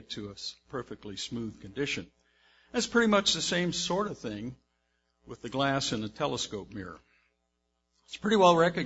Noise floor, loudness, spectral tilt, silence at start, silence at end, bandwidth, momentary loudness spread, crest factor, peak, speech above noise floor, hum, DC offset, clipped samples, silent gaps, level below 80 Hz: -79 dBFS; -29 LUFS; -4 dB/octave; 0.1 s; 0 s; 8 kHz; 18 LU; 22 dB; -8 dBFS; 49 dB; none; under 0.1%; under 0.1%; none; -60 dBFS